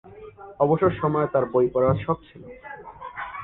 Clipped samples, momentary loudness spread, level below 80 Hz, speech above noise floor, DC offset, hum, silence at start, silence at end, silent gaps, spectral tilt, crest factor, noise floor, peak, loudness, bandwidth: under 0.1%; 22 LU; -50 dBFS; 21 dB; under 0.1%; none; 0.05 s; 0 s; none; -11.5 dB/octave; 18 dB; -43 dBFS; -6 dBFS; -23 LUFS; 4 kHz